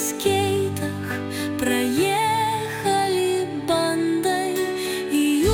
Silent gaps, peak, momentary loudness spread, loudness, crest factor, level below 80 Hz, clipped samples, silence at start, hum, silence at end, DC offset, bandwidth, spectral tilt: none; -6 dBFS; 6 LU; -22 LUFS; 16 dB; -52 dBFS; under 0.1%; 0 s; none; 0 s; under 0.1%; 18 kHz; -4.5 dB/octave